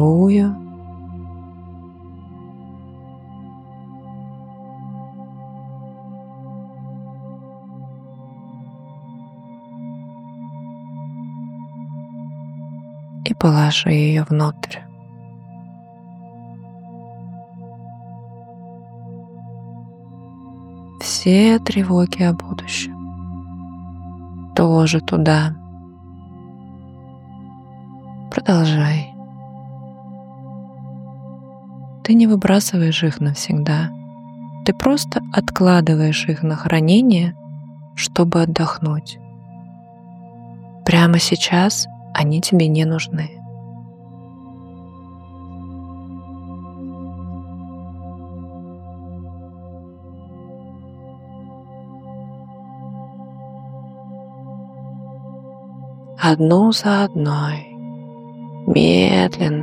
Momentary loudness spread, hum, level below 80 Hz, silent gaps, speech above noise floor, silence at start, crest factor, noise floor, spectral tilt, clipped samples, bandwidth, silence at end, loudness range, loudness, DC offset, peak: 25 LU; none; -50 dBFS; none; 25 dB; 0 s; 20 dB; -40 dBFS; -6 dB/octave; under 0.1%; 14.5 kHz; 0 s; 21 LU; -17 LUFS; under 0.1%; -2 dBFS